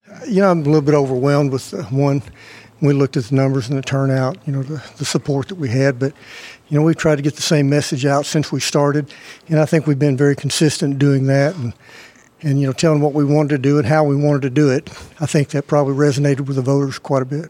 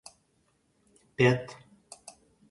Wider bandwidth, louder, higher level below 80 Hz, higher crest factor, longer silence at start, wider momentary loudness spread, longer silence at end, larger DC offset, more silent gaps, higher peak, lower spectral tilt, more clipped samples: first, 15.5 kHz vs 11.5 kHz; first, -17 LUFS vs -26 LUFS; first, -54 dBFS vs -66 dBFS; second, 16 dB vs 24 dB; second, 0.1 s vs 1.2 s; second, 9 LU vs 26 LU; second, 0 s vs 0.95 s; neither; neither; first, 0 dBFS vs -8 dBFS; about the same, -6.5 dB/octave vs -6 dB/octave; neither